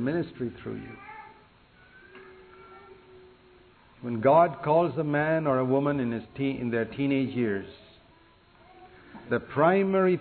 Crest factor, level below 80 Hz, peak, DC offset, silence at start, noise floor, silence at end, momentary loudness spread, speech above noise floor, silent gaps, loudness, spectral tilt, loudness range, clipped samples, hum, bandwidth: 20 dB; -62 dBFS; -8 dBFS; under 0.1%; 0 s; -58 dBFS; 0 s; 19 LU; 32 dB; none; -26 LUFS; -11 dB/octave; 16 LU; under 0.1%; none; 4.5 kHz